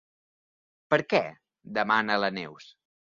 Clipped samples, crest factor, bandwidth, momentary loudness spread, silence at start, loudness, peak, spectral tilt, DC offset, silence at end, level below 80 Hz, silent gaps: under 0.1%; 22 dB; 7.4 kHz; 14 LU; 0.9 s; -27 LUFS; -8 dBFS; -5.5 dB/octave; under 0.1%; 0.5 s; -72 dBFS; none